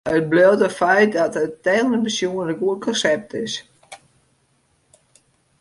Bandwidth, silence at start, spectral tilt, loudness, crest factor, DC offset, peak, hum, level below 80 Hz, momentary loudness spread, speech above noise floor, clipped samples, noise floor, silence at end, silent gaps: 11.5 kHz; 0.05 s; -4.5 dB/octave; -19 LUFS; 18 dB; under 0.1%; -4 dBFS; none; -60 dBFS; 10 LU; 45 dB; under 0.1%; -63 dBFS; 1.65 s; none